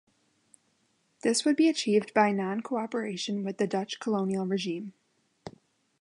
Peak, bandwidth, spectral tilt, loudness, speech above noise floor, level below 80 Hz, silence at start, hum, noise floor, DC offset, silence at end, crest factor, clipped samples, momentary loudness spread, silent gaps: -8 dBFS; 11.5 kHz; -4.5 dB/octave; -28 LUFS; 44 dB; -76 dBFS; 1.25 s; none; -72 dBFS; under 0.1%; 0.5 s; 22 dB; under 0.1%; 19 LU; none